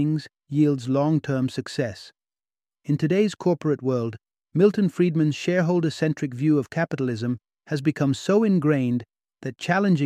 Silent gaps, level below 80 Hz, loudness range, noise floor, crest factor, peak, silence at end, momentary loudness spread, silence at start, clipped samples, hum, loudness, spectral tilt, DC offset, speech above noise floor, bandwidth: none; -66 dBFS; 3 LU; under -90 dBFS; 16 dB; -6 dBFS; 0 s; 10 LU; 0 s; under 0.1%; none; -24 LUFS; -7.5 dB/octave; under 0.1%; over 68 dB; 11 kHz